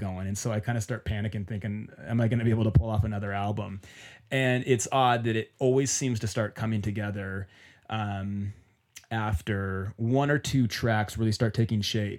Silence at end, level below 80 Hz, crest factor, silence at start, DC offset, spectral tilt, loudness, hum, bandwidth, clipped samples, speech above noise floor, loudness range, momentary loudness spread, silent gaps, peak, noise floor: 0 s; -46 dBFS; 18 dB; 0 s; under 0.1%; -5.5 dB/octave; -28 LUFS; none; 15.5 kHz; under 0.1%; 27 dB; 6 LU; 11 LU; none; -10 dBFS; -54 dBFS